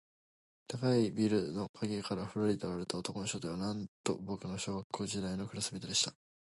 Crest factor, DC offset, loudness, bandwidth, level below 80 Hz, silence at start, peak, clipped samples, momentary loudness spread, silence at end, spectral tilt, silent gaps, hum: 20 dB; under 0.1%; -36 LUFS; 11.5 kHz; -64 dBFS; 0.7 s; -18 dBFS; under 0.1%; 8 LU; 0.4 s; -4.5 dB/octave; 1.69-1.74 s, 3.88-4.04 s, 4.84-4.90 s; none